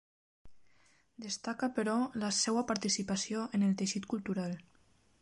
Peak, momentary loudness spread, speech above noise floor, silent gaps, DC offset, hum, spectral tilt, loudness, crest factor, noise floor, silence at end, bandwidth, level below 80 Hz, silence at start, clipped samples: -18 dBFS; 9 LU; 35 dB; none; under 0.1%; none; -4 dB/octave; -34 LUFS; 18 dB; -69 dBFS; 0.6 s; 11.5 kHz; -70 dBFS; 0.45 s; under 0.1%